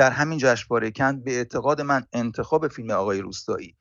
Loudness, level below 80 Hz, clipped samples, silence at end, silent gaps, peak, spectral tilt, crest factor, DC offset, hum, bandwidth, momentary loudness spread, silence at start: -24 LUFS; -56 dBFS; under 0.1%; 0.15 s; none; -6 dBFS; -5 dB/octave; 18 dB; under 0.1%; none; 7.8 kHz; 8 LU; 0 s